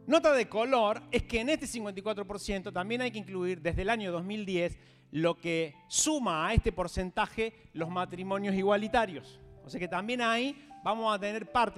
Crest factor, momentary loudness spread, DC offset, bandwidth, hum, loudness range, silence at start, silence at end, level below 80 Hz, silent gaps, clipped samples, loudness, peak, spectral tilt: 20 dB; 9 LU; under 0.1%; 15 kHz; none; 3 LU; 0 s; 0 s; -46 dBFS; none; under 0.1%; -31 LUFS; -12 dBFS; -4 dB/octave